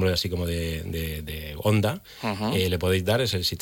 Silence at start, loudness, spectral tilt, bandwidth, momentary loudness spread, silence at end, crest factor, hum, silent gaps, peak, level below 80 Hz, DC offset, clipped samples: 0 s; -26 LUFS; -5 dB/octave; 17 kHz; 9 LU; 0 s; 14 dB; none; none; -12 dBFS; -44 dBFS; under 0.1%; under 0.1%